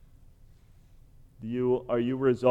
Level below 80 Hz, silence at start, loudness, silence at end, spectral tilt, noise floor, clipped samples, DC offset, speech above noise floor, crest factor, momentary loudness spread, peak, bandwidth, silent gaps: -56 dBFS; 1.4 s; -28 LUFS; 0 s; -8.5 dB/octave; -55 dBFS; under 0.1%; under 0.1%; 29 dB; 20 dB; 11 LU; -10 dBFS; 8.4 kHz; none